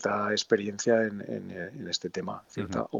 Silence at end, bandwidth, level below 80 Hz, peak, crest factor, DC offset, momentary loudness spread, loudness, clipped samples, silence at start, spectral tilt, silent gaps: 0 s; 8 kHz; -68 dBFS; -8 dBFS; 22 dB; under 0.1%; 11 LU; -30 LUFS; under 0.1%; 0 s; -4 dB/octave; none